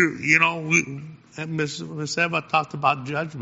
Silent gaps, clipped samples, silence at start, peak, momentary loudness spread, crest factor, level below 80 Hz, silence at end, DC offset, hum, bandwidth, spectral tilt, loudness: none; under 0.1%; 0 s; -2 dBFS; 16 LU; 22 dB; -64 dBFS; 0 s; under 0.1%; none; 8 kHz; -3 dB/octave; -22 LUFS